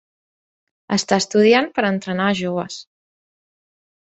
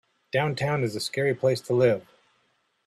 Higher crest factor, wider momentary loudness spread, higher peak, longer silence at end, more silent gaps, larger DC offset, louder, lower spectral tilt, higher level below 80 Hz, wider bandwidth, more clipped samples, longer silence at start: about the same, 18 dB vs 18 dB; first, 12 LU vs 6 LU; first, -2 dBFS vs -10 dBFS; first, 1.25 s vs 0.85 s; neither; neither; first, -18 LUFS vs -26 LUFS; second, -4.5 dB/octave vs -6 dB/octave; about the same, -62 dBFS vs -66 dBFS; second, 8.2 kHz vs 14 kHz; neither; first, 0.9 s vs 0.35 s